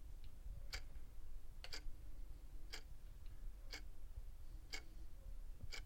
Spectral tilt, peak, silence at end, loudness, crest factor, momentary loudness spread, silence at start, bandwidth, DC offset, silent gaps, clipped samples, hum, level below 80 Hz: -3 dB/octave; -34 dBFS; 0 s; -57 LUFS; 16 dB; 8 LU; 0 s; 16.5 kHz; under 0.1%; none; under 0.1%; none; -52 dBFS